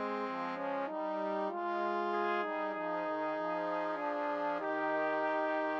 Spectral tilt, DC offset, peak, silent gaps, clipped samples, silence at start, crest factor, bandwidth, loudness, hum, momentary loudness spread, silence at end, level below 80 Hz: -6.5 dB/octave; under 0.1%; -22 dBFS; none; under 0.1%; 0 s; 14 dB; 7.2 kHz; -35 LUFS; none; 4 LU; 0 s; -80 dBFS